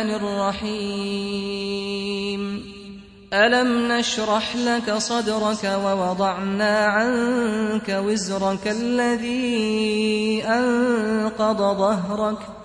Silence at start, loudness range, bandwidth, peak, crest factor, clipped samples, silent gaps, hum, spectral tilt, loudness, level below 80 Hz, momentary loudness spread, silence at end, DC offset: 0 s; 2 LU; 10.5 kHz; -6 dBFS; 16 dB; under 0.1%; none; none; -4.5 dB/octave; -22 LUFS; -54 dBFS; 7 LU; 0 s; under 0.1%